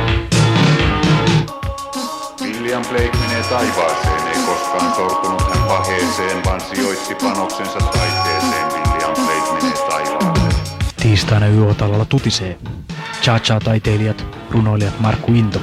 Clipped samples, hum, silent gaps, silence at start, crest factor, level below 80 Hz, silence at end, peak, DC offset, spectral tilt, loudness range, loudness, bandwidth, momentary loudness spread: under 0.1%; none; none; 0 s; 16 dB; -28 dBFS; 0 s; 0 dBFS; under 0.1%; -5 dB/octave; 2 LU; -16 LUFS; 15.5 kHz; 9 LU